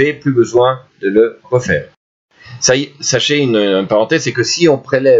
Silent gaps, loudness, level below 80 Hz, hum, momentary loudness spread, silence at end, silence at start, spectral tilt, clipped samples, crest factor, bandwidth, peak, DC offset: 1.97-2.29 s; -13 LUFS; -52 dBFS; none; 4 LU; 0 s; 0 s; -4 dB/octave; under 0.1%; 14 dB; 8 kHz; 0 dBFS; under 0.1%